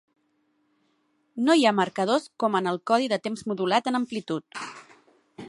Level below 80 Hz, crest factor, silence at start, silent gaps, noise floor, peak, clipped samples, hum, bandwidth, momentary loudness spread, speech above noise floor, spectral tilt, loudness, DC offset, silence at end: -74 dBFS; 20 dB; 1.35 s; none; -70 dBFS; -6 dBFS; under 0.1%; none; 11.5 kHz; 15 LU; 46 dB; -4.5 dB/octave; -25 LUFS; under 0.1%; 0 s